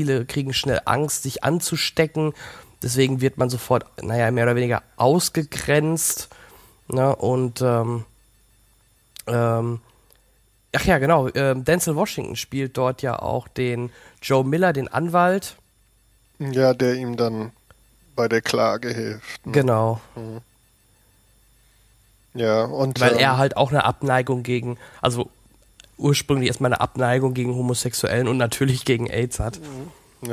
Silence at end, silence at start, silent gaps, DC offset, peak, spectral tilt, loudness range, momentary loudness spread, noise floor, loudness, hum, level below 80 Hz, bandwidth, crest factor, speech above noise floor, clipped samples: 0 s; 0 s; none; under 0.1%; -2 dBFS; -5 dB/octave; 4 LU; 13 LU; -60 dBFS; -21 LUFS; none; -46 dBFS; 16 kHz; 20 dB; 39 dB; under 0.1%